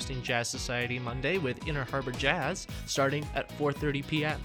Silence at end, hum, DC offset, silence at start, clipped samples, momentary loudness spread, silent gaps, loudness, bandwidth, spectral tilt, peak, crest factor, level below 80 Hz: 0 s; none; under 0.1%; 0 s; under 0.1%; 5 LU; none; -31 LUFS; 19.5 kHz; -4.5 dB/octave; -10 dBFS; 22 dB; -46 dBFS